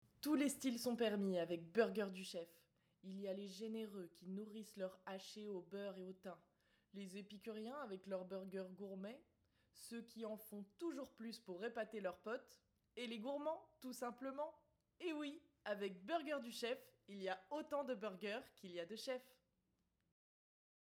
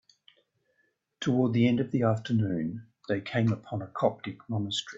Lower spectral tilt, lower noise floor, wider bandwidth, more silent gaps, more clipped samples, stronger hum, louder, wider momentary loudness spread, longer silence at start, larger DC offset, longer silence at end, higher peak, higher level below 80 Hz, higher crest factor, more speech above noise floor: second, -4.5 dB/octave vs -6.5 dB/octave; first, -86 dBFS vs -74 dBFS; first, over 20 kHz vs 8 kHz; neither; neither; neither; second, -48 LUFS vs -29 LUFS; first, 13 LU vs 10 LU; second, 0.25 s vs 1.2 s; neither; first, 1.5 s vs 0 s; second, -24 dBFS vs -10 dBFS; second, -88 dBFS vs -66 dBFS; first, 24 dB vs 18 dB; second, 39 dB vs 46 dB